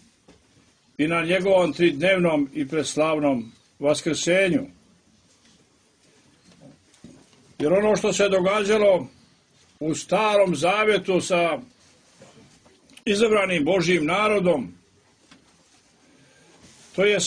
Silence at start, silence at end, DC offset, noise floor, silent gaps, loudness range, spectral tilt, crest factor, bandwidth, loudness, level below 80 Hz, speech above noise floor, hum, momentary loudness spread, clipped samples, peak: 1 s; 0 s; under 0.1%; -60 dBFS; none; 5 LU; -4.5 dB/octave; 18 dB; 10.5 kHz; -21 LUFS; -60 dBFS; 39 dB; none; 10 LU; under 0.1%; -6 dBFS